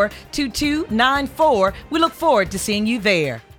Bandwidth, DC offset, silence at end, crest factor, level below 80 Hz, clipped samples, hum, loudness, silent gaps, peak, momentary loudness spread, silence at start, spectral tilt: 18.5 kHz; under 0.1%; 0.2 s; 16 dB; -42 dBFS; under 0.1%; none; -19 LUFS; none; -2 dBFS; 5 LU; 0 s; -4 dB/octave